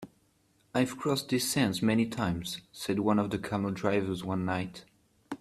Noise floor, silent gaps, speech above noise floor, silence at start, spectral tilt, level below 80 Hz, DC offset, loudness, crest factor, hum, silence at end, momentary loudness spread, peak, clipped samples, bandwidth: -69 dBFS; none; 39 dB; 0 s; -5 dB/octave; -62 dBFS; under 0.1%; -30 LUFS; 20 dB; none; 0.05 s; 9 LU; -12 dBFS; under 0.1%; 14.5 kHz